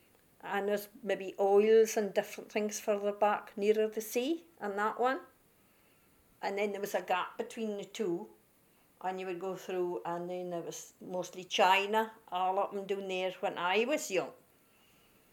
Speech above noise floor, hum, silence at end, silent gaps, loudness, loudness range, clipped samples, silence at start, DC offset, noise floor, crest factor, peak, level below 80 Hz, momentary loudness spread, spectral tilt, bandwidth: 34 dB; none; 0.95 s; none; -33 LUFS; 8 LU; under 0.1%; 0.45 s; under 0.1%; -67 dBFS; 20 dB; -14 dBFS; -82 dBFS; 13 LU; -3.5 dB/octave; 18 kHz